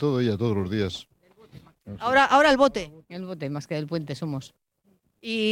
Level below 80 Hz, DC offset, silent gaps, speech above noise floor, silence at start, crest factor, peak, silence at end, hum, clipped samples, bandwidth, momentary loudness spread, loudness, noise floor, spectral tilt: -56 dBFS; under 0.1%; none; 42 dB; 0 s; 20 dB; -6 dBFS; 0 s; none; under 0.1%; 15.5 kHz; 20 LU; -24 LUFS; -67 dBFS; -5.5 dB/octave